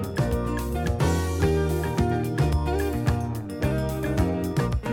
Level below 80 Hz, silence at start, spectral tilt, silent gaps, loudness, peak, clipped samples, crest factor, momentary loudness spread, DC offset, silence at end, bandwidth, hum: -32 dBFS; 0 s; -7 dB/octave; none; -25 LUFS; -10 dBFS; under 0.1%; 14 dB; 4 LU; under 0.1%; 0 s; 17.5 kHz; none